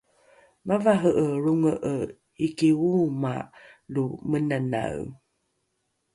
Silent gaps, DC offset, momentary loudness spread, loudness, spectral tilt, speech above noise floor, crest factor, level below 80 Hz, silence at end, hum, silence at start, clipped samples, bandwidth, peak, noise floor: none; under 0.1%; 14 LU; -25 LUFS; -7.5 dB/octave; 51 dB; 18 dB; -60 dBFS; 1 s; none; 0.65 s; under 0.1%; 11.5 kHz; -8 dBFS; -76 dBFS